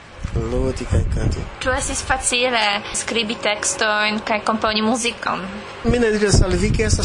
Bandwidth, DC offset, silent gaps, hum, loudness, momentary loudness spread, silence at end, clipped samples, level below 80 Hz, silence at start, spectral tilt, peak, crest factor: 11 kHz; under 0.1%; none; none; -19 LUFS; 8 LU; 0 s; under 0.1%; -28 dBFS; 0 s; -4 dB/octave; -4 dBFS; 16 dB